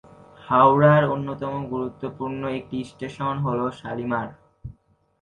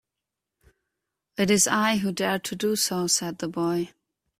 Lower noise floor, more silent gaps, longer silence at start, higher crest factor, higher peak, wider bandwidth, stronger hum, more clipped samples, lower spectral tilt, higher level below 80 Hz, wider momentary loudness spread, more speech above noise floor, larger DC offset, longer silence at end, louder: second, -53 dBFS vs -86 dBFS; neither; second, 0.4 s vs 1.4 s; about the same, 20 dB vs 20 dB; first, -2 dBFS vs -8 dBFS; second, 9.4 kHz vs 16 kHz; neither; neither; first, -8.5 dB/octave vs -3 dB/octave; first, -54 dBFS vs -64 dBFS; first, 19 LU vs 10 LU; second, 31 dB vs 61 dB; neither; about the same, 0.5 s vs 0.5 s; about the same, -23 LUFS vs -24 LUFS